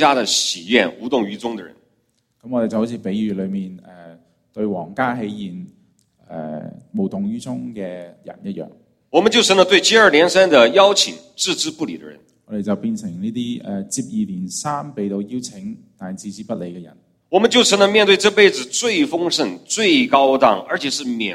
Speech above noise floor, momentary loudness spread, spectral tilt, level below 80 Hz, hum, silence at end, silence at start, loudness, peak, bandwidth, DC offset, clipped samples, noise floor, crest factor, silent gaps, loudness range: 48 dB; 20 LU; -3 dB/octave; -60 dBFS; none; 0 s; 0 s; -17 LUFS; 0 dBFS; 15 kHz; under 0.1%; under 0.1%; -66 dBFS; 18 dB; none; 13 LU